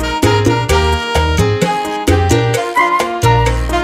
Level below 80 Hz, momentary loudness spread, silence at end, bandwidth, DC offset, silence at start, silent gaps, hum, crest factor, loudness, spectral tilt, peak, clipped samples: -22 dBFS; 3 LU; 0 s; 16 kHz; under 0.1%; 0 s; none; none; 12 dB; -13 LUFS; -5 dB/octave; 0 dBFS; under 0.1%